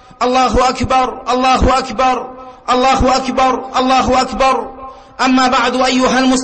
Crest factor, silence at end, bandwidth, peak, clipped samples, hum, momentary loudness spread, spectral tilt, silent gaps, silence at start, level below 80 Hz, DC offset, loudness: 10 dB; 0 s; 8.8 kHz; -4 dBFS; under 0.1%; none; 8 LU; -4 dB/octave; none; 0.2 s; -28 dBFS; under 0.1%; -13 LUFS